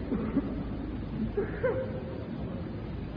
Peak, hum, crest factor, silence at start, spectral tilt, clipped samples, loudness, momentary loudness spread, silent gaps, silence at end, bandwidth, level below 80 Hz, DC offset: -18 dBFS; none; 16 dB; 0 s; -8 dB/octave; under 0.1%; -34 LUFS; 7 LU; none; 0 s; 5.2 kHz; -42 dBFS; under 0.1%